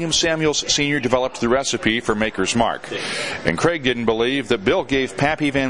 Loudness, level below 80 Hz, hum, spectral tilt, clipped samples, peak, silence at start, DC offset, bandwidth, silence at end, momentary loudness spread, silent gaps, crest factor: -19 LUFS; -44 dBFS; none; -3.5 dB/octave; under 0.1%; -2 dBFS; 0 s; 0.5%; 11.5 kHz; 0 s; 4 LU; none; 18 dB